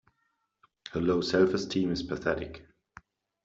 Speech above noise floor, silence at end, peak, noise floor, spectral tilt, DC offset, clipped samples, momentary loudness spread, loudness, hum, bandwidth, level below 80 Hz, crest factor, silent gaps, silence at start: 49 dB; 0.85 s; -12 dBFS; -77 dBFS; -6 dB/octave; under 0.1%; under 0.1%; 17 LU; -29 LUFS; none; 7.8 kHz; -56 dBFS; 20 dB; none; 0.9 s